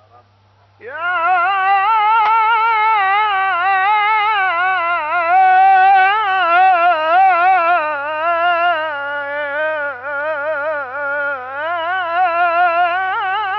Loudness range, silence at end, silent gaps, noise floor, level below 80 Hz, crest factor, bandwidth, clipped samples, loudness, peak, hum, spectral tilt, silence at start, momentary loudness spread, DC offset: 7 LU; 0 s; none; -52 dBFS; -70 dBFS; 10 dB; 5.8 kHz; under 0.1%; -14 LUFS; -4 dBFS; 50 Hz at -55 dBFS; 1.5 dB/octave; 0.85 s; 10 LU; under 0.1%